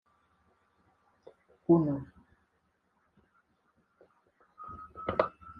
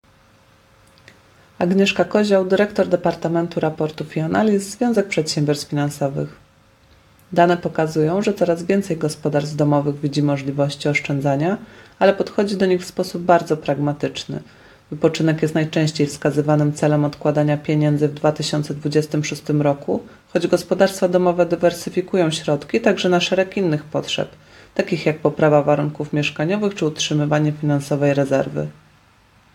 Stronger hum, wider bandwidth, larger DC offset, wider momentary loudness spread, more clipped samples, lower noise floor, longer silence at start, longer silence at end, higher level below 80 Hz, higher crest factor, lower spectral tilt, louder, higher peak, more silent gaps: neither; second, 4.9 kHz vs 14 kHz; neither; first, 22 LU vs 7 LU; neither; first, -76 dBFS vs -53 dBFS; about the same, 1.7 s vs 1.6 s; second, 0 s vs 0.8 s; second, -66 dBFS vs -56 dBFS; first, 26 dB vs 18 dB; first, -10.5 dB/octave vs -6 dB/octave; second, -30 LUFS vs -19 LUFS; second, -10 dBFS vs 0 dBFS; neither